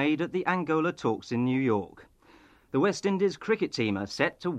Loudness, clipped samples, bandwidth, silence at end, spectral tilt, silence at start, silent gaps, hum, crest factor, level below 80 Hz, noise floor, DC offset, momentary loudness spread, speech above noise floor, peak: -28 LUFS; under 0.1%; 11 kHz; 0 s; -6 dB/octave; 0 s; none; none; 20 dB; -66 dBFS; -58 dBFS; under 0.1%; 4 LU; 30 dB; -10 dBFS